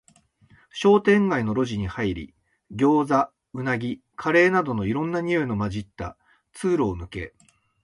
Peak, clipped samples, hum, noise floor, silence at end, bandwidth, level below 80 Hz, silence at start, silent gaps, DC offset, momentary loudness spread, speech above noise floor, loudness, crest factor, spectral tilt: -6 dBFS; under 0.1%; none; -58 dBFS; 0.55 s; 11.5 kHz; -48 dBFS; 0.75 s; none; under 0.1%; 17 LU; 36 dB; -23 LUFS; 18 dB; -7 dB/octave